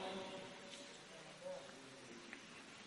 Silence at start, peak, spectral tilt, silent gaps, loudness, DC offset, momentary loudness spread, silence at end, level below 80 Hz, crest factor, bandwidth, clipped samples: 0 s; -34 dBFS; -3 dB/octave; none; -53 LUFS; under 0.1%; 6 LU; 0 s; -84 dBFS; 18 dB; 11.5 kHz; under 0.1%